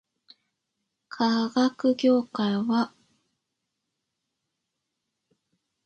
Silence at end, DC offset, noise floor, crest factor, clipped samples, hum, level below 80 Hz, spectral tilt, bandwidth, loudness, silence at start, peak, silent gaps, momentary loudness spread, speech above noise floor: 3 s; under 0.1%; -82 dBFS; 18 dB; under 0.1%; none; -76 dBFS; -6 dB/octave; 8.2 kHz; -25 LUFS; 1.1 s; -10 dBFS; none; 5 LU; 59 dB